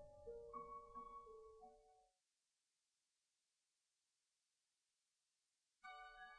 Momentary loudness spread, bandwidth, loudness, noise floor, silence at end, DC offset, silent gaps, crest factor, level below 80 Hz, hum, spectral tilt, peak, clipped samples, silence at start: 9 LU; 9.6 kHz; -59 LUFS; under -90 dBFS; 0 s; under 0.1%; none; 20 dB; -78 dBFS; none; -4 dB/octave; -42 dBFS; under 0.1%; 0 s